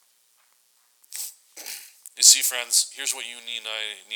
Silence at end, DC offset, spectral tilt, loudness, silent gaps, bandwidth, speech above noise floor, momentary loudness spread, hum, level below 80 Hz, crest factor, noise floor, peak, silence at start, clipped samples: 0 s; under 0.1%; 6 dB/octave; -19 LUFS; none; over 20 kHz; 36 dB; 24 LU; none; under -90 dBFS; 26 dB; -64 dBFS; 0 dBFS; 1.1 s; under 0.1%